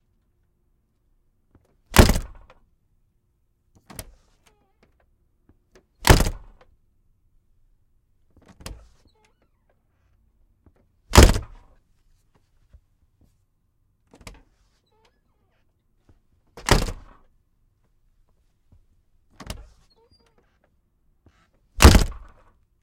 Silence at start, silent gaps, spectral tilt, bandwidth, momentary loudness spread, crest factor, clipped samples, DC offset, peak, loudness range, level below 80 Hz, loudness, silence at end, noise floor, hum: 1.9 s; none; -4.5 dB/octave; 16.5 kHz; 29 LU; 26 dB; under 0.1%; under 0.1%; 0 dBFS; 7 LU; -30 dBFS; -18 LUFS; 0.7 s; -68 dBFS; none